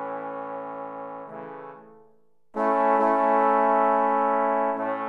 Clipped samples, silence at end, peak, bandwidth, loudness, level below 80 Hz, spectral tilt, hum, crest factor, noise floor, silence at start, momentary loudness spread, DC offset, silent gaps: under 0.1%; 0 s; -8 dBFS; 5.2 kHz; -23 LUFS; -78 dBFS; -7.5 dB/octave; none; 16 dB; -63 dBFS; 0 s; 18 LU; under 0.1%; none